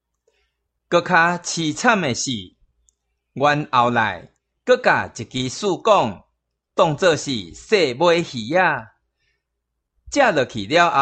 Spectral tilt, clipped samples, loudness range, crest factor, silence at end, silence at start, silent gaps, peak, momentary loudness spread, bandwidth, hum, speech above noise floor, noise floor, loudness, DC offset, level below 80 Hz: -4 dB/octave; under 0.1%; 2 LU; 20 dB; 0 s; 0.9 s; none; -2 dBFS; 10 LU; 9 kHz; none; 59 dB; -77 dBFS; -19 LUFS; under 0.1%; -56 dBFS